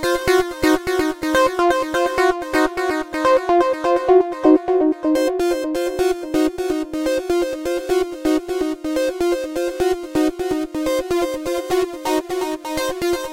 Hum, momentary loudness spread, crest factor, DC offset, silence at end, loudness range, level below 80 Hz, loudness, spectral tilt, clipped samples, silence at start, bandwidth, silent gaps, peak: none; 7 LU; 18 dB; under 0.1%; 0 s; 4 LU; -44 dBFS; -19 LUFS; -4 dB/octave; under 0.1%; 0 s; 16.5 kHz; none; -2 dBFS